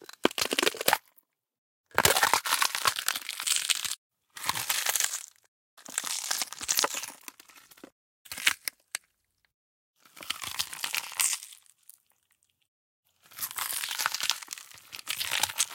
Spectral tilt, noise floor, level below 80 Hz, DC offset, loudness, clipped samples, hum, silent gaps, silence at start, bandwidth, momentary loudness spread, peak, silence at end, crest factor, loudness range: 0 dB/octave; -74 dBFS; -66 dBFS; under 0.1%; -28 LUFS; under 0.1%; none; 1.58-1.84 s, 3.98-4.10 s, 5.48-5.77 s, 7.92-8.25 s, 9.54-9.94 s, 12.68-13.03 s; 0 s; 17 kHz; 16 LU; -2 dBFS; 0 s; 32 dB; 8 LU